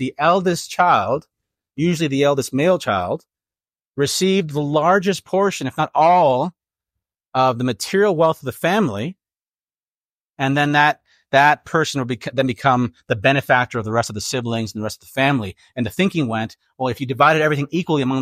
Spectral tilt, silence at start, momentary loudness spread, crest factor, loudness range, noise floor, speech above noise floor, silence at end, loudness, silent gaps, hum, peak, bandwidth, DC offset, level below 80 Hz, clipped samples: -5 dB/octave; 0 s; 11 LU; 18 dB; 3 LU; under -90 dBFS; over 72 dB; 0 s; -19 LUFS; 3.89-3.94 s, 9.54-9.59 s, 9.78-10.33 s; none; -2 dBFS; 16 kHz; under 0.1%; -60 dBFS; under 0.1%